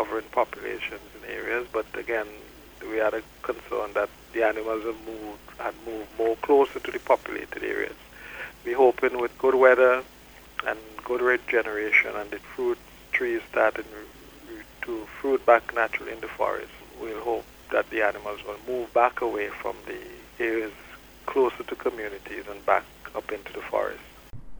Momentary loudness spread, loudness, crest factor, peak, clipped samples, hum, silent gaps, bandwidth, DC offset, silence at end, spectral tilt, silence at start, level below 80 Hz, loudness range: 18 LU; -26 LUFS; 22 dB; -4 dBFS; under 0.1%; none; none; over 20 kHz; under 0.1%; 0 s; -4.5 dB/octave; 0 s; -56 dBFS; 7 LU